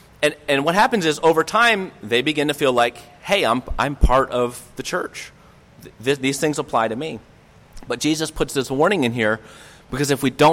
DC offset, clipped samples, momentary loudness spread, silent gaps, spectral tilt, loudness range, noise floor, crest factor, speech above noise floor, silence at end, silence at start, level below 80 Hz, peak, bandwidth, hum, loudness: under 0.1%; under 0.1%; 12 LU; none; -4 dB/octave; 6 LU; -47 dBFS; 16 dB; 27 dB; 0 s; 0.2 s; -32 dBFS; -6 dBFS; 16.5 kHz; none; -20 LUFS